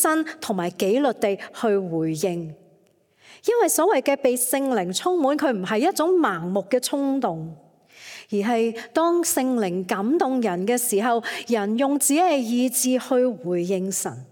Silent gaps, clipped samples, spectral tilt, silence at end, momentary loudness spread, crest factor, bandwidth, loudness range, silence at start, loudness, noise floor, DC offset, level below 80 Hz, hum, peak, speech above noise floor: none; under 0.1%; -4 dB/octave; 0.05 s; 7 LU; 16 dB; 17.5 kHz; 3 LU; 0 s; -22 LUFS; -60 dBFS; under 0.1%; -74 dBFS; none; -6 dBFS; 38 dB